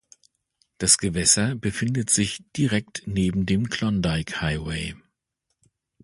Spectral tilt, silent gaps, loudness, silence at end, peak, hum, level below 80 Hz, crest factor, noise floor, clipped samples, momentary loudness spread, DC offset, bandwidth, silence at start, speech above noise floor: -3.5 dB/octave; none; -23 LUFS; 1.1 s; -2 dBFS; none; -44 dBFS; 22 dB; -79 dBFS; under 0.1%; 10 LU; under 0.1%; 11.5 kHz; 0.8 s; 55 dB